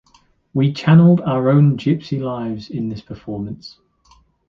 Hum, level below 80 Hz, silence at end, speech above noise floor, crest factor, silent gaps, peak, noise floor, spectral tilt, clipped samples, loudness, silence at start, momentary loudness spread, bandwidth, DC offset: none; -52 dBFS; 0.8 s; 40 dB; 16 dB; none; -2 dBFS; -56 dBFS; -9 dB/octave; under 0.1%; -17 LUFS; 0.55 s; 18 LU; 6.6 kHz; under 0.1%